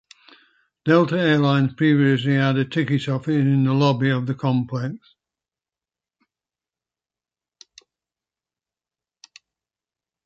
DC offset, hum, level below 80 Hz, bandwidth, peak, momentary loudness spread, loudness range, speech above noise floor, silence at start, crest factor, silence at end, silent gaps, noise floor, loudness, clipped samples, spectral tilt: under 0.1%; none; -64 dBFS; 7.8 kHz; -4 dBFS; 8 LU; 11 LU; over 71 dB; 0.85 s; 18 dB; 5.3 s; none; under -90 dBFS; -20 LUFS; under 0.1%; -8 dB/octave